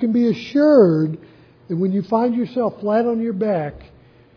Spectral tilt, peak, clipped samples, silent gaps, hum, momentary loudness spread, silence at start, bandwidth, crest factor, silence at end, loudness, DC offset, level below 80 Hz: -9 dB/octave; -2 dBFS; under 0.1%; none; none; 12 LU; 0 s; 5.4 kHz; 16 dB; 0.55 s; -18 LUFS; under 0.1%; -54 dBFS